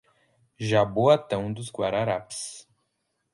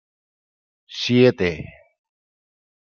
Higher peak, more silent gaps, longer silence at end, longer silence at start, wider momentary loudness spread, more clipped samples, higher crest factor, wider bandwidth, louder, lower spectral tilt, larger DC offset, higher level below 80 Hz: second, -6 dBFS vs -2 dBFS; neither; second, 0.7 s vs 1.35 s; second, 0.6 s vs 0.9 s; second, 14 LU vs 20 LU; neither; about the same, 20 dB vs 22 dB; first, 11.5 kHz vs 7 kHz; second, -25 LUFS vs -19 LUFS; about the same, -5.5 dB/octave vs -6 dB/octave; neither; about the same, -58 dBFS vs -56 dBFS